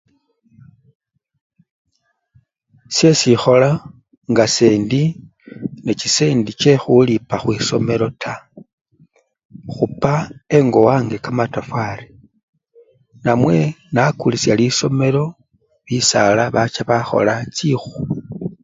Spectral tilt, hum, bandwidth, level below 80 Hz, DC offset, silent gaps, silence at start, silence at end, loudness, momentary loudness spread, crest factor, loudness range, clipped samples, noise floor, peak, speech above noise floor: -5 dB/octave; none; 7.8 kHz; -50 dBFS; under 0.1%; 4.17-4.21 s, 8.73-8.85 s, 9.45-9.49 s, 12.43-12.53 s; 2.9 s; 0.1 s; -16 LUFS; 13 LU; 18 dB; 4 LU; under 0.1%; -63 dBFS; 0 dBFS; 48 dB